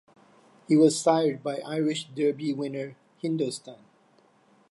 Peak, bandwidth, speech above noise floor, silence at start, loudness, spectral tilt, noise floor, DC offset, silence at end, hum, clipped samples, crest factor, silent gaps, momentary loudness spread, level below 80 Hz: -8 dBFS; 11.5 kHz; 36 dB; 0.7 s; -26 LUFS; -5.5 dB/octave; -62 dBFS; under 0.1%; 0.95 s; none; under 0.1%; 20 dB; none; 14 LU; -82 dBFS